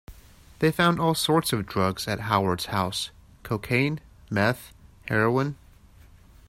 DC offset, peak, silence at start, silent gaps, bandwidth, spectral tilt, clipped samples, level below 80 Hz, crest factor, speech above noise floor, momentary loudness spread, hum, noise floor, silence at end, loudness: under 0.1%; -6 dBFS; 0.1 s; none; 16 kHz; -5 dB/octave; under 0.1%; -52 dBFS; 20 dB; 28 dB; 11 LU; none; -52 dBFS; 0.95 s; -25 LUFS